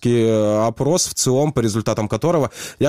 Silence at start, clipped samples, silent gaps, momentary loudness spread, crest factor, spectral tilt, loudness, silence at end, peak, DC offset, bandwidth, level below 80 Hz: 0 s; under 0.1%; none; 4 LU; 14 dB; -5 dB/octave; -18 LUFS; 0 s; -4 dBFS; 0.4%; 16 kHz; -46 dBFS